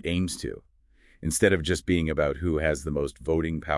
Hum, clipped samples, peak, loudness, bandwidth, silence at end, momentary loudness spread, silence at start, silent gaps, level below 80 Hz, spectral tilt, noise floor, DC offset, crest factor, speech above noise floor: none; under 0.1%; -6 dBFS; -26 LUFS; 12 kHz; 0 s; 12 LU; 0.05 s; none; -42 dBFS; -5 dB/octave; -59 dBFS; under 0.1%; 20 dB; 33 dB